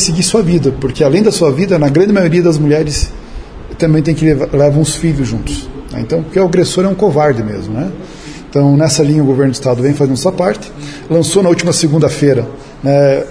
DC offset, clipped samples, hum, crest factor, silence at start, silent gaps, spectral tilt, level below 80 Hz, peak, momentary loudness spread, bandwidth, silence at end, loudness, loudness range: 0.2%; under 0.1%; none; 12 dB; 0 s; none; -6 dB/octave; -30 dBFS; 0 dBFS; 13 LU; 11 kHz; 0 s; -12 LUFS; 2 LU